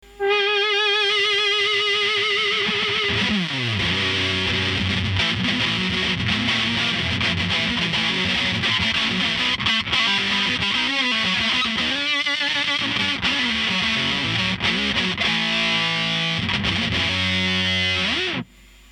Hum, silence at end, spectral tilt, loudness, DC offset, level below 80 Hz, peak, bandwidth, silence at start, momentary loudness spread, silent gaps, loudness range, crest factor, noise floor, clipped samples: none; 0.5 s; -3.5 dB/octave; -19 LUFS; under 0.1%; -46 dBFS; -6 dBFS; 13 kHz; 0.05 s; 3 LU; none; 1 LU; 16 dB; -42 dBFS; under 0.1%